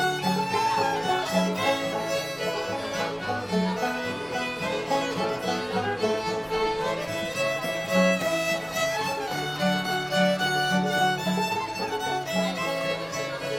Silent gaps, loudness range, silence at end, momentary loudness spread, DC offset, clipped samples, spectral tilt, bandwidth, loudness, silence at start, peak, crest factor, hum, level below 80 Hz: none; 3 LU; 0 s; 6 LU; under 0.1%; under 0.1%; -4 dB/octave; 18 kHz; -26 LUFS; 0 s; -10 dBFS; 16 dB; none; -56 dBFS